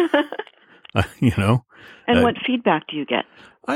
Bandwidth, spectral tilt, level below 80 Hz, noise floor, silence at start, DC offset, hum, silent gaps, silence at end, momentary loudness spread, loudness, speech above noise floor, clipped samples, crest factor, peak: 13.5 kHz; -7 dB/octave; -46 dBFS; -49 dBFS; 0 s; under 0.1%; none; none; 0 s; 14 LU; -21 LUFS; 28 dB; under 0.1%; 18 dB; -2 dBFS